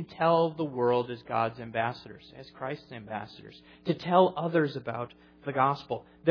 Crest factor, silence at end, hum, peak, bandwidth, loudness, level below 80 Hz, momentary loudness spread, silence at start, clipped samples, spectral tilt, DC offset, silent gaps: 22 dB; 0 s; none; -8 dBFS; 5.4 kHz; -29 LUFS; -68 dBFS; 17 LU; 0 s; under 0.1%; -8.5 dB/octave; under 0.1%; none